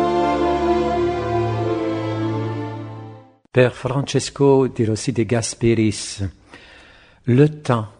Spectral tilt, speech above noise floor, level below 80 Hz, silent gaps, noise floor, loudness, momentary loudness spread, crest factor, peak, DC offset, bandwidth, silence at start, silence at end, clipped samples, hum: -6 dB/octave; 30 dB; -44 dBFS; none; -48 dBFS; -20 LUFS; 13 LU; 20 dB; 0 dBFS; under 0.1%; 10 kHz; 0 s; 0.1 s; under 0.1%; none